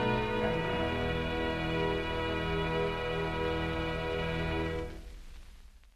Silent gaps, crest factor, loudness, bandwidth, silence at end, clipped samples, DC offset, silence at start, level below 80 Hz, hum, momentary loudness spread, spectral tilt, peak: none; 14 dB; -33 LUFS; 13 kHz; 0.05 s; under 0.1%; under 0.1%; 0 s; -42 dBFS; none; 5 LU; -6.5 dB/octave; -18 dBFS